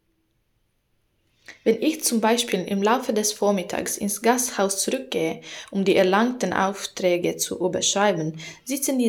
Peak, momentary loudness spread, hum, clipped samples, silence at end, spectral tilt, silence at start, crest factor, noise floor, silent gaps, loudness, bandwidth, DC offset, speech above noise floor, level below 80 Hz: -6 dBFS; 7 LU; none; under 0.1%; 0 s; -3.5 dB/octave; 1.5 s; 18 dB; -69 dBFS; none; -23 LUFS; 19.5 kHz; under 0.1%; 47 dB; -66 dBFS